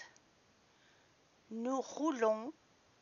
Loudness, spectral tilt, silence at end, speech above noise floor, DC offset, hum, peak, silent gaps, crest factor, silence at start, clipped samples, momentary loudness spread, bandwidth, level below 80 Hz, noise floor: -38 LUFS; -3.5 dB/octave; 0.5 s; 33 dB; under 0.1%; none; -20 dBFS; none; 20 dB; 0 s; under 0.1%; 16 LU; 7.2 kHz; -88 dBFS; -70 dBFS